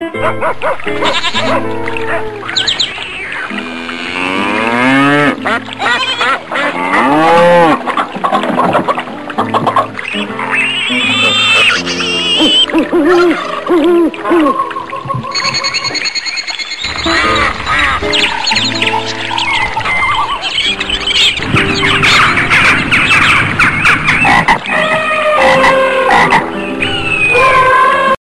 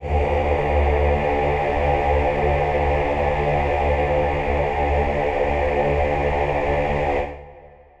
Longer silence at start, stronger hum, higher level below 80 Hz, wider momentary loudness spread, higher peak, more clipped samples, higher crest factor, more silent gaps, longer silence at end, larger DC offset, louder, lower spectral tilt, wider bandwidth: about the same, 0 s vs 0 s; neither; second, -36 dBFS vs -26 dBFS; first, 10 LU vs 2 LU; first, 0 dBFS vs -6 dBFS; neither; about the same, 12 dB vs 14 dB; neither; second, 0.05 s vs 0.35 s; neither; first, -10 LUFS vs -21 LUFS; second, -3.5 dB/octave vs -8 dB/octave; first, 13.5 kHz vs 7.6 kHz